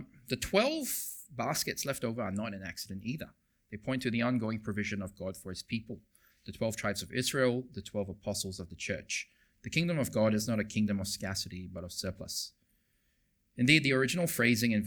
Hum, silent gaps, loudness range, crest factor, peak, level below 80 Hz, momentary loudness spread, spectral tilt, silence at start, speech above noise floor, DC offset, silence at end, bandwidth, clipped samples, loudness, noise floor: none; none; 4 LU; 24 dB; -8 dBFS; -62 dBFS; 14 LU; -4.5 dB/octave; 0 s; 41 dB; under 0.1%; 0 s; over 20 kHz; under 0.1%; -33 LUFS; -74 dBFS